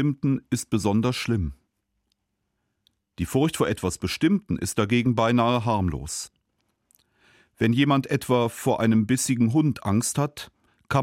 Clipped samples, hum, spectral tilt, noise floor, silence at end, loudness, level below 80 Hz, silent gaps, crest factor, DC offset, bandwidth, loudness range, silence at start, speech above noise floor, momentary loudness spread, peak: under 0.1%; none; -5.5 dB/octave; -77 dBFS; 0 s; -24 LUFS; -50 dBFS; none; 16 dB; under 0.1%; 16.5 kHz; 5 LU; 0 s; 54 dB; 9 LU; -8 dBFS